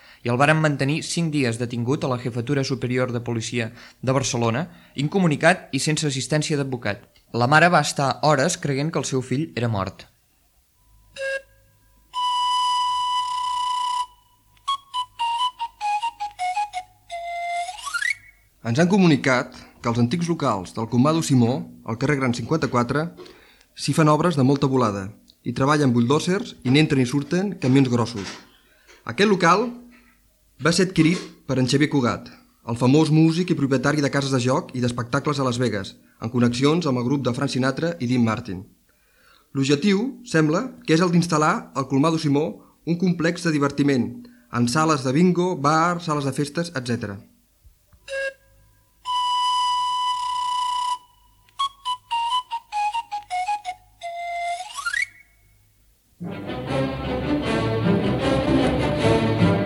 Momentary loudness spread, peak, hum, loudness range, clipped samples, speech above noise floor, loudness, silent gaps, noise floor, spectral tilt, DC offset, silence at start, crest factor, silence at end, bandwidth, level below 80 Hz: 12 LU; -4 dBFS; none; 7 LU; under 0.1%; 41 dB; -22 LUFS; none; -62 dBFS; -5.5 dB/octave; under 0.1%; 0.25 s; 18 dB; 0 s; 15 kHz; -50 dBFS